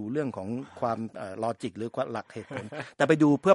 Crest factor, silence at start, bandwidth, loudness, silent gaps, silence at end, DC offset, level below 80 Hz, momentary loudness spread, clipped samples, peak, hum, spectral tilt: 20 dB; 0 s; 11 kHz; -30 LUFS; none; 0 s; under 0.1%; -72 dBFS; 16 LU; under 0.1%; -8 dBFS; none; -7 dB/octave